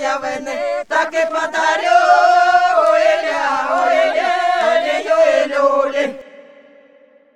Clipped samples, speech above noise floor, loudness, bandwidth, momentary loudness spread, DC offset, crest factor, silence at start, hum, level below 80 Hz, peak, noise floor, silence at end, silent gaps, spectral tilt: under 0.1%; 31 dB; -15 LUFS; 11 kHz; 10 LU; 0.3%; 16 dB; 0 s; none; -62 dBFS; 0 dBFS; -49 dBFS; 0.95 s; none; -1.5 dB/octave